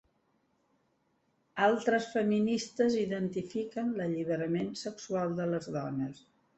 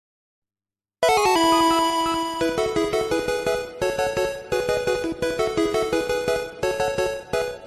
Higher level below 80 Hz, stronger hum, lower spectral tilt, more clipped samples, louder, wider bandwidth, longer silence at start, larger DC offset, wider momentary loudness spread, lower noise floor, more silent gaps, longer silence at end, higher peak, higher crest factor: second, -72 dBFS vs -48 dBFS; neither; first, -6 dB/octave vs -3.5 dB/octave; neither; second, -32 LUFS vs -22 LUFS; second, 8.2 kHz vs 14 kHz; first, 1.55 s vs 1 s; neither; about the same, 8 LU vs 8 LU; second, -75 dBFS vs under -90 dBFS; neither; first, 0.4 s vs 0 s; second, -14 dBFS vs -8 dBFS; about the same, 20 dB vs 16 dB